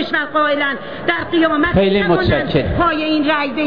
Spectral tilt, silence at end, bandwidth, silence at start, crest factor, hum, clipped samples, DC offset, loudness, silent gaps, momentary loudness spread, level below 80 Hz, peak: -8.5 dB/octave; 0 s; 5.4 kHz; 0 s; 12 dB; none; under 0.1%; 1%; -16 LUFS; none; 5 LU; -34 dBFS; -4 dBFS